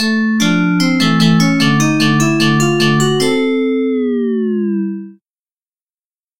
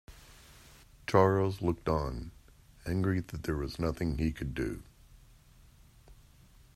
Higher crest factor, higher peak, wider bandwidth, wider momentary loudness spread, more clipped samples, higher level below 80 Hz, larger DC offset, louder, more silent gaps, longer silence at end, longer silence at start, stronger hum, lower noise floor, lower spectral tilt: second, 12 dB vs 24 dB; first, 0 dBFS vs -10 dBFS; first, 16.5 kHz vs 14.5 kHz; second, 5 LU vs 18 LU; neither; about the same, -48 dBFS vs -48 dBFS; neither; first, -13 LUFS vs -32 LUFS; neither; first, 1.2 s vs 0.6 s; about the same, 0 s vs 0.1 s; neither; first, under -90 dBFS vs -59 dBFS; second, -5 dB/octave vs -7.5 dB/octave